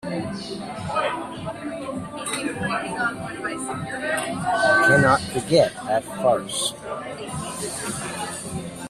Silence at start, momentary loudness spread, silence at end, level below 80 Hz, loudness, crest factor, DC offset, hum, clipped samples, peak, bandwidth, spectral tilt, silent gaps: 0.05 s; 14 LU; 0 s; -54 dBFS; -24 LUFS; 20 dB; under 0.1%; none; under 0.1%; -4 dBFS; 14.5 kHz; -4 dB/octave; none